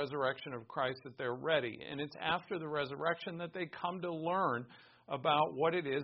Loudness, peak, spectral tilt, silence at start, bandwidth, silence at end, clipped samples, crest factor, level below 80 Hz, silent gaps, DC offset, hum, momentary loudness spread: -37 LUFS; -16 dBFS; -3 dB/octave; 0 s; 5.6 kHz; 0 s; under 0.1%; 20 dB; -76 dBFS; none; under 0.1%; none; 10 LU